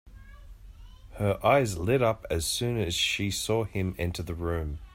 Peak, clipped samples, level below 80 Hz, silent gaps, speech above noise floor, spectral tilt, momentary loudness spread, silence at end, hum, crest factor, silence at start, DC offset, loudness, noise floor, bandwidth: -10 dBFS; under 0.1%; -46 dBFS; none; 20 dB; -4.5 dB/octave; 9 LU; 0.05 s; none; 18 dB; 0.05 s; under 0.1%; -28 LUFS; -48 dBFS; 16 kHz